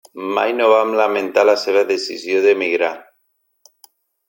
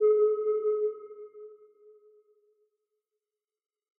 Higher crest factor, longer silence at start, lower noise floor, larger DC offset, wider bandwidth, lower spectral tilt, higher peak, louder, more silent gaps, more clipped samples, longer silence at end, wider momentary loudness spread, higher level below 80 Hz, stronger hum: about the same, 16 dB vs 16 dB; first, 0.15 s vs 0 s; second, -67 dBFS vs under -90 dBFS; neither; first, 17 kHz vs 2.3 kHz; first, -3 dB/octave vs 0 dB/octave; first, -2 dBFS vs -16 dBFS; first, -16 LUFS vs -28 LUFS; neither; neither; second, 1.25 s vs 2.45 s; second, 8 LU vs 24 LU; first, -70 dBFS vs under -90 dBFS; neither